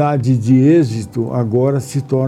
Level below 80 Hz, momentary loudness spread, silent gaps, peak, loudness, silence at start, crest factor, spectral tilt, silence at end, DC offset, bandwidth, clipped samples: -52 dBFS; 9 LU; none; -2 dBFS; -15 LUFS; 0 s; 12 dB; -8.5 dB/octave; 0 s; under 0.1%; 12.5 kHz; under 0.1%